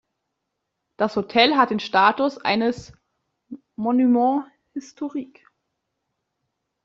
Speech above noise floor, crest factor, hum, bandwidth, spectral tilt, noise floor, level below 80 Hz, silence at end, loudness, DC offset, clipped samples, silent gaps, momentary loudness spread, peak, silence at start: 59 dB; 20 dB; none; 7.6 kHz; -5 dB/octave; -79 dBFS; -64 dBFS; 1.6 s; -21 LUFS; under 0.1%; under 0.1%; none; 18 LU; -4 dBFS; 1 s